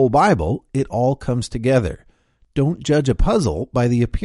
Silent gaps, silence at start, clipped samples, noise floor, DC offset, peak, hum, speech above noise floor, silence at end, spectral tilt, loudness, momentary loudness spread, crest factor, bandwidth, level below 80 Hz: none; 0 s; under 0.1%; -56 dBFS; under 0.1%; -2 dBFS; none; 38 dB; 0 s; -7 dB/octave; -19 LUFS; 7 LU; 16 dB; 11.5 kHz; -30 dBFS